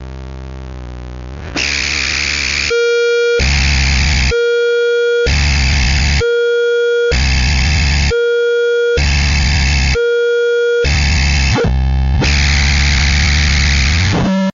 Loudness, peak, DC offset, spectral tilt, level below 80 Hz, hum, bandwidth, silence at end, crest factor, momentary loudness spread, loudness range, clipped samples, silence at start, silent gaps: -13 LUFS; -2 dBFS; under 0.1%; -4 dB/octave; -16 dBFS; none; 7.6 kHz; 0.05 s; 10 dB; 4 LU; 1 LU; under 0.1%; 0 s; none